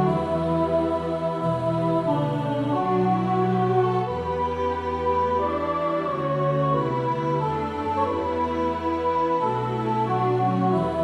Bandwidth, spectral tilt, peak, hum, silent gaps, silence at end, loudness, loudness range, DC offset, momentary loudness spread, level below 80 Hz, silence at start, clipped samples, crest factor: 10.5 kHz; -8.5 dB/octave; -10 dBFS; none; none; 0 s; -24 LUFS; 1 LU; under 0.1%; 4 LU; -48 dBFS; 0 s; under 0.1%; 12 dB